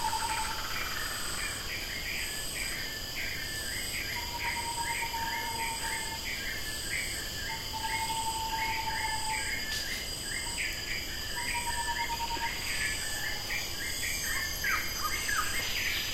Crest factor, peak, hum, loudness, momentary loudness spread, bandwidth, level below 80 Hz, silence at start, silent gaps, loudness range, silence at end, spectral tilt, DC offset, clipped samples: 16 dB; -18 dBFS; none; -32 LUFS; 4 LU; 16 kHz; -46 dBFS; 0 s; none; 2 LU; 0 s; -1 dB/octave; under 0.1%; under 0.1%